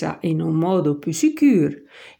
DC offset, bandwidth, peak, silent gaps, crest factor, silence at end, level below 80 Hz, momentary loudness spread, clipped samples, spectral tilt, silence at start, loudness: under 0.1%; 17 kHz; -6 dBFS; none; 14 dB; 0.15 s; -66 dBFS; 7 LU; under 0.1%; -6.5 dB/octave; 0 s; -19 LUFS